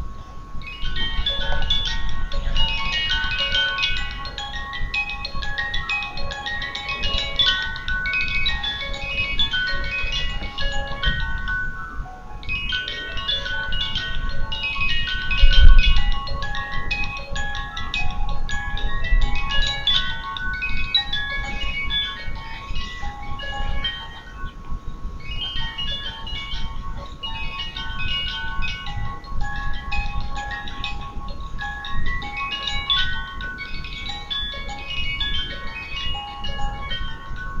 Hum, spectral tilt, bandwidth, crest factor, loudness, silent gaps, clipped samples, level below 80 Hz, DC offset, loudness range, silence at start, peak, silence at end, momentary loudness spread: none; -3.5 dB/octave; 7.2 kHz; 22 dB; -24 LUFS; none; under 0.1%; -24 dBFS; under 0.1%; 8 LU; 0 s; 0 dBFS; 0 s; 12 LU